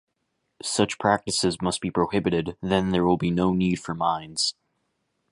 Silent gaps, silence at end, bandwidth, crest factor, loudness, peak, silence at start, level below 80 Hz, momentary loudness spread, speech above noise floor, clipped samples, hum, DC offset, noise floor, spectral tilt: none; 0.8 s; 11.5 kHz; 20 dB; -24 LUFS; -4 dBFS; 0.65 s; -50 dBFS; 4 LU; 52 dB; under 0.1%; none; under 0.1%; -76 dBFS; -4.5 dB/octave